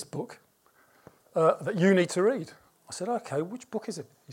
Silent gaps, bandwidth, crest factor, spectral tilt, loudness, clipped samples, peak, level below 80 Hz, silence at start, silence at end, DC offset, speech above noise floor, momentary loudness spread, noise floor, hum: none; 16 kHz; 20 dB; -6 dB/octave; -28 LUFS; under 0.1%; -10 dBFS; -78 dBFS; 0 s; 0 s; under 0.1%; 36 dB; 18 LU; -64 dBFS; none